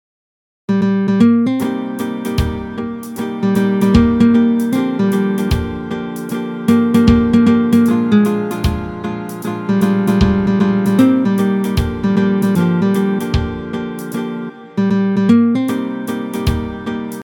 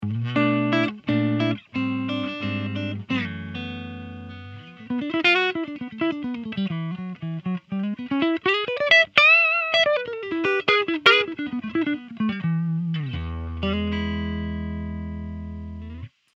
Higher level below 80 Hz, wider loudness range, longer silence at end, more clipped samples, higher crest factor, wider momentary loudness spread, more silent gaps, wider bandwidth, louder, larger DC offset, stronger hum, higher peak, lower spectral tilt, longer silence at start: first, -30 dBFS vs -44 dBFS; second, 3 LU vs 11 LU; second, 0 s vs 0.3 s; neither; second, 14 dB vs 24 dB; second, 12 LU vs 18 LU; neither; first, 19 kHz vs 8.2 kHz; first, -15 LUFS vs -22 LUFS; neither; neither; about the same, 0 dBFS vs 0 dBFS; first, -7.5 dB/octave vs -6 dB/octave; first, 0.7 s vs 0 s